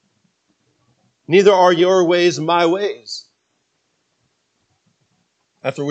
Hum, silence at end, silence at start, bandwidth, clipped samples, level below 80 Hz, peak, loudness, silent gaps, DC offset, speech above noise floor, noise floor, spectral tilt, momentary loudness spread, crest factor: none; 0 s; 1.3 s; 8.2 kHz; under 0.1%; -74 dBFS; 0 dBFS; -15 LUFS; none; under 0.1%; 53 dB; -68 dBFS; -5 dB/octave; 17 LU; 18 dB